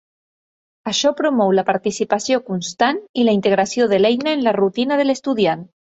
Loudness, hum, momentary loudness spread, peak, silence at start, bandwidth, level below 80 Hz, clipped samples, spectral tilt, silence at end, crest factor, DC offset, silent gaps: -18 LUFS; none; 5 LU; -2 dBFS; 0.85 s; 8.2 kHz; -62 dBFS; under 0.1%; -4.5 dB/octave; 0.25 s; 16 dB; under 0.1%; 3.09-3.14 s